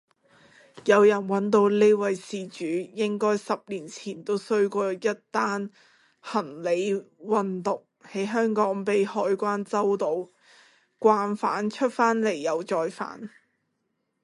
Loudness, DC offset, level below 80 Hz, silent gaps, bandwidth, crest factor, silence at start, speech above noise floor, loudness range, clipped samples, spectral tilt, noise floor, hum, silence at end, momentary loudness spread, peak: -25 LUFS; under 0.1%; -76 dBFS; none; 11.5 kHz; 20 dB; 0.75 s; 52 dB; 5 LU; under 0.1%; -5.5 dB/octave; -77 dBFS; none; 0.95 s; 14 LU; -6 dBFS